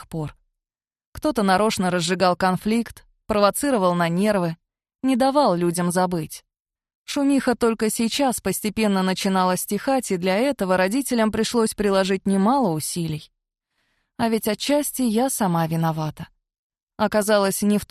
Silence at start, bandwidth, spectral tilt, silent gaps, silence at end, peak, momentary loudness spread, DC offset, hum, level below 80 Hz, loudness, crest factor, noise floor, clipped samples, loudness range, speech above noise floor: 0 s; 14 kHz; -5 dB/octave; 1.06-1.12 s, 6.60-6.65 s, 6.95-7.05 s, 16.59-16.70 s, 16.83-16.87 s; 0.05 s; -4 dBFS; 9 LU; under 0.1%; none; -52 dBFS; -21 LUFS; 18 dB; under -90 dBFS; under 0.1%; 3 LU; over 69 dB